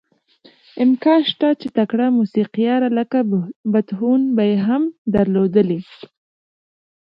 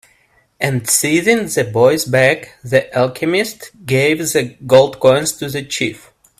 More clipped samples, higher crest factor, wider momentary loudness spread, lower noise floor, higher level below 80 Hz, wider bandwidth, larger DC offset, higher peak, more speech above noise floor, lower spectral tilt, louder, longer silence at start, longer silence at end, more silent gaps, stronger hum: neither; about the same, 16 dB vs 16 dB; second, 5 LU vs 9 LU; second, -52 dBFS vs -56 dBFS; about the same, -54 dBFS vs -52 dBFS; second, 5.6 kHz vs 16 kHz; neither; about the same, -2 dBFS vs 0 dBFS; second, 35 dB vs 41 dB; first, -9.5 dB/octave vs -4 dB/octave; second, -18 LUFS vs -15 LUFS; first, 0.75 s vs 0.6 s; first, 1.2 s vs 0.4 s; first, 3.56-3.64 s, 4.98-5.05 s vs none; neither